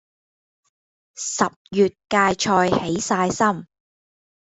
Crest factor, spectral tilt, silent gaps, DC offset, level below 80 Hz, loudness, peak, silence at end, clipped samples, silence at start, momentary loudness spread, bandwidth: 20 dB; -4 dB/octave; 1.56-1.65 s; under 0.1%; -56 dBFS; -21 LUFS; -2 dBFS; 0.85 s; under 0.1%; 1.15 s; 7 LU; 8.4 kHz